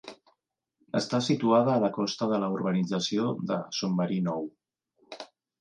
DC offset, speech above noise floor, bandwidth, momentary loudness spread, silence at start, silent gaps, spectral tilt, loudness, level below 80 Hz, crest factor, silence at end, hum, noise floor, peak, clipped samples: under 0.1%; 51 dB; 9.6 kHz; 21 LU; 0.05 s; none; -6 dB/octave; -28 LUFS; -74 dBFS; 18 dB; 0.35 s; none; -78 dBFS; -10 dBFS; under 0.1%